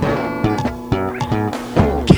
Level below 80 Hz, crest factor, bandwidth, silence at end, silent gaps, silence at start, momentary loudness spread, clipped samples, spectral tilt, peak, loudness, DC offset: -30 dBFS; 18 dB; over 20 kHz; 0 s; none; 0 s; 4 LU; 0.1%; -7 dB/octave; 0 dBFS; -19 LUFS; under 0.1%